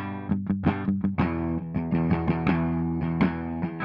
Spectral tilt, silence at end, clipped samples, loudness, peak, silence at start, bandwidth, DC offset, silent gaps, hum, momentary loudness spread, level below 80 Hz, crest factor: -10.5 dB/octave; 0 s; under 0.1%; -27 LUFS; -10 dBFS; 0 s; 5.4 kHz; under 0.1%; none; none; 5 LU; -46 dBFS; 16 dB